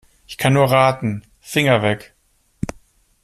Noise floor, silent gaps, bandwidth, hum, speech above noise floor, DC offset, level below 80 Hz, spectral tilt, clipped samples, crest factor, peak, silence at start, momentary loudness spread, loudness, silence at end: -52 dBFS; none; 14.5 kHz; none; 35 dB; under 0.1%; -48 dBFS; -5.5 dB/octave; under 0.1%; 18 dB; -2 dBFS; 0.3 s; 16 LU; -17 LUFS; 0.5 s